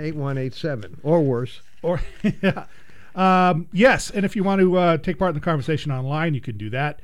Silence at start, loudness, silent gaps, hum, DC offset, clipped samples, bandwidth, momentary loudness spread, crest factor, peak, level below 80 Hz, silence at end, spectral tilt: 0 s; -21 LUFS; none; none; 2%; under 0.1%; 12 kHz; 12 LU; 18 dB; -4 dBFS; -42 dBFS; 0.1 s; -6.5 dB/octave